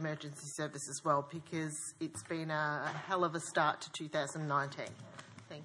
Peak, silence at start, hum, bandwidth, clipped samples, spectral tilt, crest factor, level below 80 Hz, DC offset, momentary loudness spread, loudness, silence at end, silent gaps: -16 dBFS; 0 s; none; 12 kHz; under 0.1%; -4 dB/octave; 22 dB; -84 dBFS; under 0.1%; 12 LU; -37 LUFS; 0 s; none